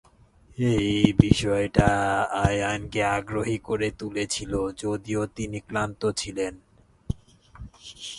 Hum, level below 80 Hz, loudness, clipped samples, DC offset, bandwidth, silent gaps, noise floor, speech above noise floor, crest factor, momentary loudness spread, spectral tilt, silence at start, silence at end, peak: none; -40 dBFS; -25 LUFS; under 0.1%; under 0.1%; 11.5 kHz; none; -56 dBFS; 31 dB; 26 dB; 15 LU; -5.5 dB/octave; 0.6 s; 0 s; 0 dBFS